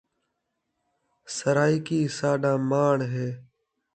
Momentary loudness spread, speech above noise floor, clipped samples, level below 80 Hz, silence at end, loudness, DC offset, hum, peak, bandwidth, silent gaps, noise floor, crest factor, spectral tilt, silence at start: 11 LU; 55 dB; under 0.1%; -68 dBFS; 0.55 s; -25 LUFS; under 0.1%; none; -8 dBFS; 9.2 kHz; none; -79 dBFS; 18 dB; -6 dB/octave; 1.25 s